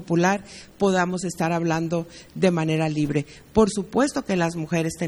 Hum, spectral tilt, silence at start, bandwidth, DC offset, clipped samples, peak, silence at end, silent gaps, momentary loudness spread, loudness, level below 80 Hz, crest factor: none; -6 dB/octave; 0 s; 13 kHz; under 0.1%; under 0.1%; -4 dBFS; 0 s; none; 7 LU; -23 LUFS; -50 dBFS; 20 dB